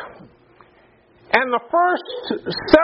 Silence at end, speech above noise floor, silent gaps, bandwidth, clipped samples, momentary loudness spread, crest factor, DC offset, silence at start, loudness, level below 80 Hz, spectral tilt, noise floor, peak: 0 s; 36 dB; none; 5.8 kHz; under 0.1%; 9 LU; 20 dB; under 0.1%; 0 s; -20 LUFS; -46 dBFS; -2 dB/octave; -54 dBFS; 0 dBFS